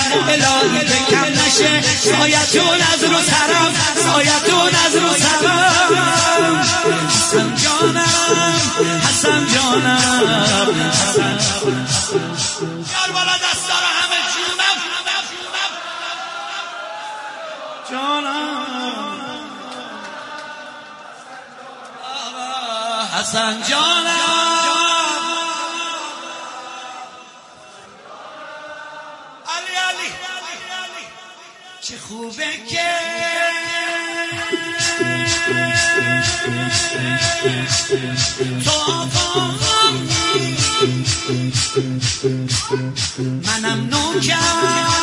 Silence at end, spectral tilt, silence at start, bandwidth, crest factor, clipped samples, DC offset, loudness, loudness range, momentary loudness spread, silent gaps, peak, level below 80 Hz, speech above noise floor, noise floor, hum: 0 s; -2.5 dB/octave; 0 s; 11.5 kHz; 18 dB; under 0.1%; under 0.1%; -15 LUFS; 13 LU; 18 LU; none; 0 dBFS; -50 dBFS; 25 dB; -41 dBFS; none